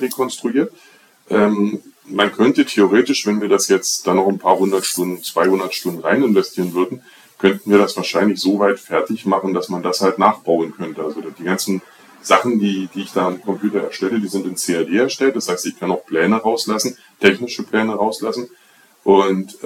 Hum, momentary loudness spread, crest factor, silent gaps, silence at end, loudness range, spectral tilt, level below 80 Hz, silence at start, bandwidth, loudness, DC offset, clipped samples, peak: none; 9 LU; 18 dB; none; 0 s; 4 LU; -4 dB/octave; -64 dBFS; 0 s; 17.5 kHz; -18 LUFS; under 0.1%; under 0.1%; 0 dBFS